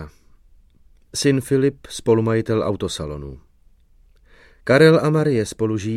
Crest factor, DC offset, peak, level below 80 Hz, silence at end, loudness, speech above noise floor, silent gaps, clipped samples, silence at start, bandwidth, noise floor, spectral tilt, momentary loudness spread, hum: 20 dB; under 0.1%; 0 dBFS; -46 dBFS; 0 s; -19 LUFS; 35 dB; none; under 0.1%; 0 s; 14.5 kHz; -53 dBFS; -6 dB/octave; 18 LU; none